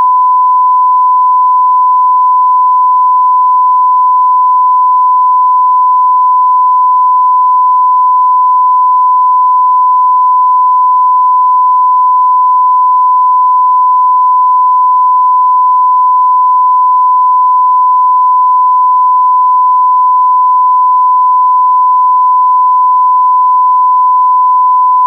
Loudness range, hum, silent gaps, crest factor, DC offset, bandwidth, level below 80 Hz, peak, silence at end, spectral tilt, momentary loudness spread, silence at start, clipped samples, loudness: 0 LU; none; none; 4 dB; under 0.1%; 1.2 kHz; under -90 dBFS; -4 dBFS; 0 s; -4 dB/octave; 0 LU; 0 s; under 0.1%; -7 LUFS